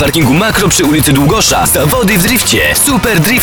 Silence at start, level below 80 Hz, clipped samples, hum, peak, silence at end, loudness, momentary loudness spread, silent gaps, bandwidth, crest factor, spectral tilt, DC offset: 0 s; -26 dBFS; under 0.1%; none; 0 dBFS; 0 s; -8 LUFS; 1 LU; none; over 20 kHz; 8 dB; -3.5 dB/octave; under 0.1%